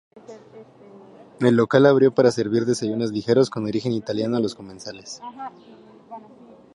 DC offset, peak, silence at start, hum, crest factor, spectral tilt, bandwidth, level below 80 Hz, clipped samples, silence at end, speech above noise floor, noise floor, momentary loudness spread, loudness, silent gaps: under 0.1%; -2 dBFS; 0.15 s; none; 20 dB; -6.5 dB/octave; 11 kHz; -64 dBFS; under 0.1%; 0.55 s; 26 dB; -47 dBFS; 22 LU; -20 LUFS; none